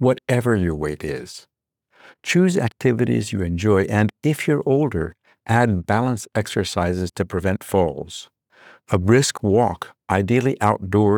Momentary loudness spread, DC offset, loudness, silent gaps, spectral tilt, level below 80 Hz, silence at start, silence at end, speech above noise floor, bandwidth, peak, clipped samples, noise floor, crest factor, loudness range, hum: 12 LU; under 0.1%; -20 LUFS; none; -6 dB/octave; -50 dBFS; 0 s; 0 s; 41 dB; 19.5 kHz; -2 dBFS; under 0.1%; -60 dBFS; 18 dB; 2 LU; none